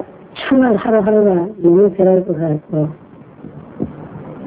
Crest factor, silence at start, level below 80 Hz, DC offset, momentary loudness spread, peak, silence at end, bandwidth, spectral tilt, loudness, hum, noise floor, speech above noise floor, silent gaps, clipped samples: 14 dB; 0 s; -50 dBFS; under 0.1%; 20 LU; -2 dBFS; 0 s; 4 kHz; -12 dB/octave; -14 LUFS; none; -36 dBFS; 24 dB; none; under 0.1%